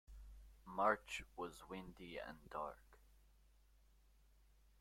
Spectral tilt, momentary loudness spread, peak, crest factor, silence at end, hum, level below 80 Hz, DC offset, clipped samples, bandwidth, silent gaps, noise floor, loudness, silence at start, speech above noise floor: -4.5 dB/octave; 24 LU; -22 dBFS; 26 dB; 1.5 s; none; -66 dBFS; under 0.1%; under 0.1%; 16.5 kHz; none; -71 dBFS; -45 LUFS; 0.1 s; 26 dB